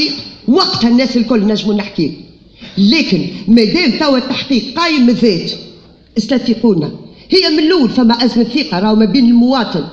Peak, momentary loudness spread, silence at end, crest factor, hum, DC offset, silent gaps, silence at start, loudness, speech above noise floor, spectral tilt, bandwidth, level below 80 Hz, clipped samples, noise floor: 0 dBFS; 9 LU; 0 s; 12 dB; none; under 0.1%; none; 0 s; -12 LUFS; 26 dB; -6 dB/octave; 7.4 kHz; -42 dBFS; under 0.1%; -37 dBFS